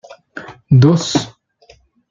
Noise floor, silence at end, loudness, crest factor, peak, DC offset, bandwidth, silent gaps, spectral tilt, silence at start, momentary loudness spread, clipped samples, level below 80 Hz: -50 dBFS; 0.8 s; -13 LUFS; 14 dB; -2 dBFS; under 0.1%; 7.6 kHz; none; -6.5 dB/octave; 0.35 s; 23 LU; under 0.1%; -48 dBFS